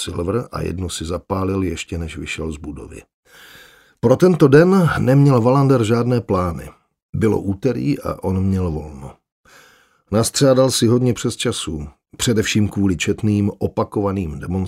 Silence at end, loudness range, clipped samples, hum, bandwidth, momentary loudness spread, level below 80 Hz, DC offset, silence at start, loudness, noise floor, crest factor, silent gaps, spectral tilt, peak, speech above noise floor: 0 s; 9 LU; under 0.1%; none; 16 kHz; 14 LU; -40 dBFS; under 0.1%; 0 s; -18 LUFS; -53 dBFS; 18 dB; 3.14-3.23 s, 7.02-7.13 s, 9.32-9.44 s; -6 dB/octave; 0 dBFS; 35 dB